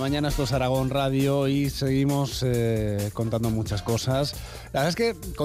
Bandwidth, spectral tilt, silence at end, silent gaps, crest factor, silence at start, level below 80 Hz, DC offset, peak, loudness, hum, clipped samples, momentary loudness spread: 16 kHz; -6 dB/octave; 0 s; none; 12 dB; 0 s; -40 dBFS; under 0.1%; -12 dBFS; -25 LUFS; none; under 0.1%; 4 LU